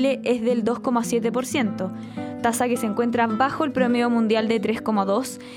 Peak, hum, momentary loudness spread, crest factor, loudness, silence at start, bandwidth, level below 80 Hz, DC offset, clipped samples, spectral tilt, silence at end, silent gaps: -6 dBFS; none; 5 LU; 16 dB; -23 LUFS; 0 s; 17 kHz; -62 dBFS; under 0.1%; under 0.1%; -5 dB/octave; 0 s; none